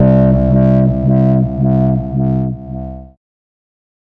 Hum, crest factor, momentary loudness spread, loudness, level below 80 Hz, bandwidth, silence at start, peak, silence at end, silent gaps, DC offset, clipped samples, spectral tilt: none; 10 dB; 16 LU; -13 LUFS; -28 dBFS; 3 kHz; 0 s; -2 dBFS; 1.05 s; none; under 0.1%; under 0.1%; -12.5 dB/octave